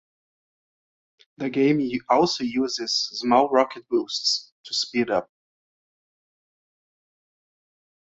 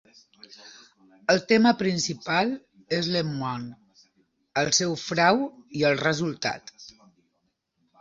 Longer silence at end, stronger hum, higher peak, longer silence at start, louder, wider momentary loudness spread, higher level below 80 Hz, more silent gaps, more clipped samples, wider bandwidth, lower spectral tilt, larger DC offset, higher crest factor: first, 2.95 s vs 1.15 s; neither; about the same, -4 dBFS vs -6 dBFS; first, 1.4 s vs 0.5 s; about the same, -23 LUFS vs -25 LUFS; second, 7 LU vs 17 LU; about the same, -66 dBFS vs -64 dBFS; first, 4.52-4.64 s vs none; neither; about the same, 8 kHz vs 8 kHz; about the same, -3.5 dB/octave vs -4 dB/octave; neither; about the same, 22 dB vs 20 dB